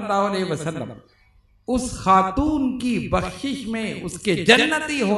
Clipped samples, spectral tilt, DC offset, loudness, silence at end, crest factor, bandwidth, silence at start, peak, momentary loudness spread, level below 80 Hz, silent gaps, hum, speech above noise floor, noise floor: under 0.1%; -4.5 dB/octave; under 0.1%; -21 LUFS; 0 s; 22 dB; 12 kHz; 0 s; 0 dBFS; 13 LU; -42 dBFS; none; none; 35 dB; -57 dBFS